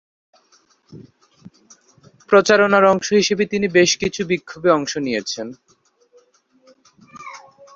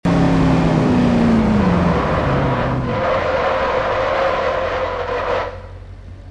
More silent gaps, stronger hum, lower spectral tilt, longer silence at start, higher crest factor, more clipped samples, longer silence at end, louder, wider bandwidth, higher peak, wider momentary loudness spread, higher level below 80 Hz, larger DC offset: neither; neither; second, -4 dB/octave vs -7.5 dB/octave; first, 0.95 s vs 0.05 s; first, 20 dB vs 14 dB; neither; first, 0.35 s vs 0 s; about the same, -17 LUFS vs -17 LUFS; second, 7.6 kHz vs 10 kHz; first, 0 dBFS vs -4 dBFS; first, 21 LU vs 9 LU; second, -58 dBFS vs -30 dBFS; neither